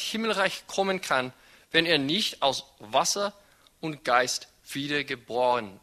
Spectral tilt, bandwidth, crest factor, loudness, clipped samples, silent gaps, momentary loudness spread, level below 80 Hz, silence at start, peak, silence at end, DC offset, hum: -2.5 dB/octave; 13.5 kHz; 22 dB; -26 LUFS; under 0.1%; none; 11 LU; -66 dBFS; 0 s; -6 dBFS; 0.05 s; under 0.1%; none